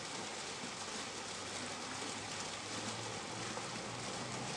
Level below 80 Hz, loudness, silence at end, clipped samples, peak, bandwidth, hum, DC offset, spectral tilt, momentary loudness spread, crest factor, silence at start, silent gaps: -72 dBFS; -42 LUFS; 0 s; under 0.1%; -28 dBFS; 11.5 kHz; none; under 0.1%; -2.5 dB/octave; 1 LU; 16 dB; 0 s; none